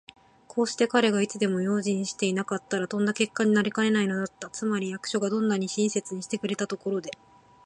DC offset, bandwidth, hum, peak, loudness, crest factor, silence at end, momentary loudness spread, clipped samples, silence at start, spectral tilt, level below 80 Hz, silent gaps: under 0.1%; 10.5 kHz; none; -8 dBFS; -27 LUFS; 20 dB; 0.5 s; 8 LU; under 0.1%; 0.55 s; -4.5 dB/octave; -70 dBFS; none